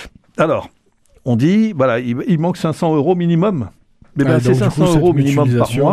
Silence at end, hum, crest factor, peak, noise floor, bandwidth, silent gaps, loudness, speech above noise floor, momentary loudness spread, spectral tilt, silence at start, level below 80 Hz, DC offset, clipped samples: 0 s; none; 14 dB; 0 dBFS; -54 dBFS; 14.5 kHz; none; -15 LUFS; 40 dB; 9 LU; -7.5 dB/octave; 0 s; -42 dBFS; 0.1%; under 0.1%